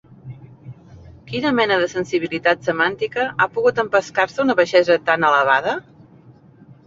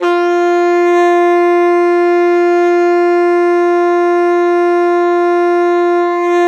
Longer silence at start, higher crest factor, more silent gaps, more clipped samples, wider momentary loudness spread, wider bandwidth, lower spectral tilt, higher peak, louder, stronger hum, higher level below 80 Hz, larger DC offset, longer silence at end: first, 0.25 s vs 0 s; first, 18 dB vs 8 dB; neither; neither; first, 10 LU vs 2 LU; about the same, 7.6 kHz vs 7.4 kHz; first, -5 dB/octave vs -3.5 dB/octave; about the same, -2 dBFS vs -4 dBFS; second, -18 LUFS vs -11 LUFS; neither; first, -56 dBFS vs -90 dBFS; neither; first, 1.05 s vs 0 s